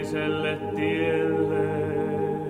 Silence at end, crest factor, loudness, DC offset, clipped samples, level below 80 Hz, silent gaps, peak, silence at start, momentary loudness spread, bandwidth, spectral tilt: 0 s; 12 dB; -26 LUFS; under 0.1%; under 0.1%; -56 dBFS; none; -14 dBFS; 0 s; 3 LU; 13.5 kHz; -7 dB/octave